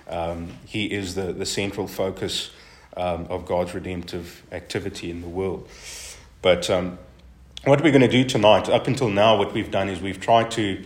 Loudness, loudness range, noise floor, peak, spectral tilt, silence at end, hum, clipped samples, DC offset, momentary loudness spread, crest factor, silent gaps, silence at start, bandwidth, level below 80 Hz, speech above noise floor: -22 LUFS; 10 LU; -44 dBFS; 0 dBFS; -5 dB/octave; 0 s; none; under 0.1%; under 0.1%; 18 LU; 22 dB; none; 0.1 s; 16 kHz; -50 dBFS; 22 dB